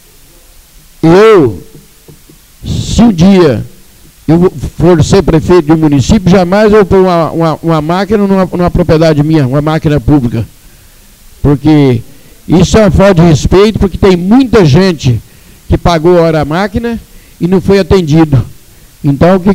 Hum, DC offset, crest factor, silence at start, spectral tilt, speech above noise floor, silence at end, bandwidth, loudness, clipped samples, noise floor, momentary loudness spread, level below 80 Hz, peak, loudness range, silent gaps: none; under 0.1%; 8 dB; 1.05 s; -7 dB/octave; 32 dB; 0 s; 16 kHz; -7 LUFS; 0.5%; -38 dBFS; 11 LU; -24 dBFS; 0 dBFS; 3 LU; none